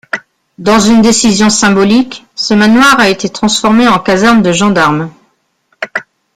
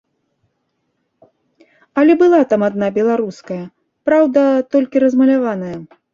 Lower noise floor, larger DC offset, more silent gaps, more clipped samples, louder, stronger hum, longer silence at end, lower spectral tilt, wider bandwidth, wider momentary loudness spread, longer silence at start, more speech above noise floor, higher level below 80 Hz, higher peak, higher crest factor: second, -57 dBFS vs -69 dBFS; neither; neither; neither; first, -8 LUFS vs -14 LUFS; neither; about the same, 0.35 s vs 0.3 s; second, -4 dB/octave vs -7.5 dB/octave; first, 15 kHz vs 7.4 kHz; second, 13 LU vs 16 LU; second, 0.15 s vs 1.95 s; second, 50 dB vs 55 dB; first, -40 dBFS vs -60 dBFS; about the same, 0 dBFS vs -2 dBFS; about the same, 10 dB vs 14 dB